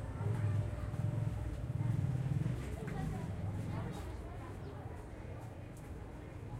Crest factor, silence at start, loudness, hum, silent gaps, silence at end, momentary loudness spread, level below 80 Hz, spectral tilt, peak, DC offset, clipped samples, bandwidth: 14 dB; 0 s; -41 LUFS; none; none; 0 s; 12 LU; -50 dBFS; -8 dB/octave; -24 dBFS; under 0.1%; under 0.1%; 13.5 kHz